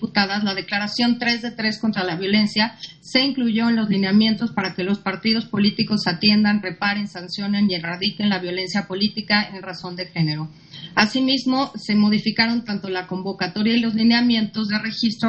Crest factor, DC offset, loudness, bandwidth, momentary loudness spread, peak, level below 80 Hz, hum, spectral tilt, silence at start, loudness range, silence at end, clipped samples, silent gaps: 20 dB; under 0.1%; -20 LUFS; 8.4 kHz; 9 LU; -2 dBFS; -58 dBFS; none; -5.5 dB/octave; 0 s; 3 LU; 0 s; under 0.1%; none